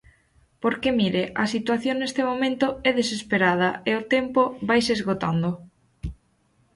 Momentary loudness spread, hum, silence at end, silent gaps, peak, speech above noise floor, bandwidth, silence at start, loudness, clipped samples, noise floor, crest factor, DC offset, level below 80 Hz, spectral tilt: 8 LU; none; 0.6 s; none; -6 dBFS; 42 dB; 11.5 kHz; 0.6 s; -23 LUFS; under 0.1%; -65 dBFS; 18 dB; under 0.1%; -50 dBFS; -5 dB/octave